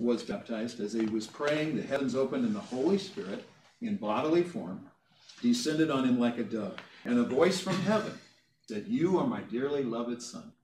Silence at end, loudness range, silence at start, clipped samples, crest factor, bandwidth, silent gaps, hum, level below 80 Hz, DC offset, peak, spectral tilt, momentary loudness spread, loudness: 0.1 s; 3 LU; 0 s; under 0.1%; 18 dB; 13 kHz; none; none; -74 dBFS; under 0.1%; -12 dBFS; -5.5 dB/octave; 13 LU; -31 LUFS